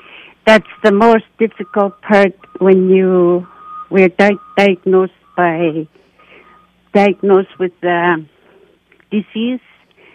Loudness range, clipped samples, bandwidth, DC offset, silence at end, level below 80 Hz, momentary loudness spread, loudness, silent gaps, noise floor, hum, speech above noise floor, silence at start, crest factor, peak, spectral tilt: 4 LU; under 0.1%; 9.4 kHz; under 0.1%; 0.55 s; -56 dBFS; 10 LU; -13 LUFS; none; -51 dBFS; none; 38 dB; 0.45 s; 14 dB; 0 dBFS; -7 dB/octave